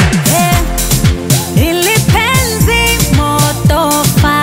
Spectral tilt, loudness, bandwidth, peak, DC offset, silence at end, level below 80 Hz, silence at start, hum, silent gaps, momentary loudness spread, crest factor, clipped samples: -4 dB/octave; -10 LUFS; 16.5 kHz; 0 dBFS; under 0.1%; 0 s; -20 dBFS; 0 s; none; none; 2 LU; 10 dB; under 0.1%